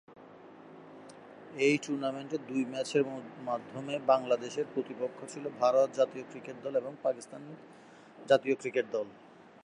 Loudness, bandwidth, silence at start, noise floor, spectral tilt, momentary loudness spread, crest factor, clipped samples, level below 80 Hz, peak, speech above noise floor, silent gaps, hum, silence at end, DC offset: -32 LUFS; 11 kHz; 0.1 s; -52 dBFS; -5 dB/octave; 23 LU; 22 dB; under 0.1%; -84 dBFS; -12 dBFS; 21 dB; none; none; 0.2 s; under 0.1%